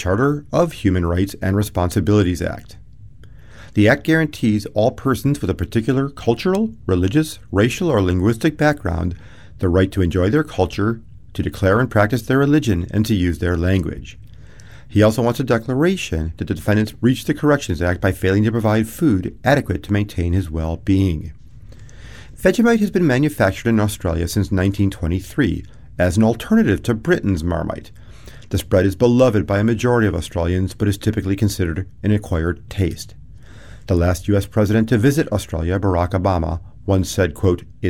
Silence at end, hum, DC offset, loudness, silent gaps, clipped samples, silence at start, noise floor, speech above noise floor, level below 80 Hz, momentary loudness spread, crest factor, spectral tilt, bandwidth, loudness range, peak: 0 s; none; 0.6%; -18 LUFS; none; under 0.1%; 0 s; -42 dBFS; 24 dB; -38 dBFS; 8 LU; 16 dB; -7 dB/octave; 16 kHz; 2 LU; -2 dBFS